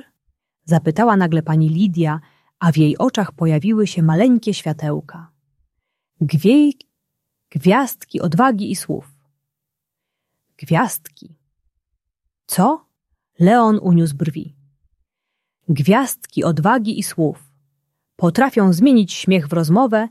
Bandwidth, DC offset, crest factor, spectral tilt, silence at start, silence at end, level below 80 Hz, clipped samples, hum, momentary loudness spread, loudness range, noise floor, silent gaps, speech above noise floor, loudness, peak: 14.5 kHz; under 0.1%; 16 dB; -6.5 dB/octave; 0.65 s; 0 s; -60 dBFS; under 0.1%; none; 11 LU; 6 LU; -81 dBFS; none; 66 dB; -17 LUFS; -2 dBFS